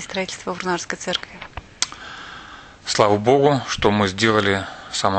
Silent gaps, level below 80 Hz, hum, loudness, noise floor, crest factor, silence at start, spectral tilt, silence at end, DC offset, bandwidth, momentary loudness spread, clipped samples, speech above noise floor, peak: none; -48 dBFS; none; -20 LUFS; -41 dBFS; 22 dB; 0 s; -4 dB/octave; 0 s; under 0.1%; 9.2 kHz; 19 LU; under 0.1%; 21 dB; 0 dBFS